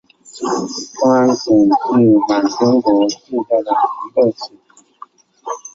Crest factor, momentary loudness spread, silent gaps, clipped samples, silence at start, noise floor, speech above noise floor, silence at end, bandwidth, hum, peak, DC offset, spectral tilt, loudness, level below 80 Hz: 14 dB; 14 LU; none; under 0.1%; 0.35 s; -42 dBFS; 27 dB; 0.05 s; 7.8 kHz; none; -2 dBFS; under 0.1%; -5.5 dB/octave; -15 LUFS; -58 dBFS